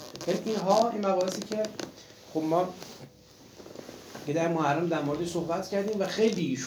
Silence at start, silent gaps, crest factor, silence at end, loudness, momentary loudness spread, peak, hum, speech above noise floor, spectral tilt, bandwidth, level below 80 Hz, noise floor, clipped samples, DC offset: 0 s; none; 20 dB; 0 s; -29 LUFS; 19 LU; -10 dBFS; none; 25 dB; -5.5 dB/octave; over 20 kHz; -68 dBFS; -54 dBFS; under 0.1%; under 0.1%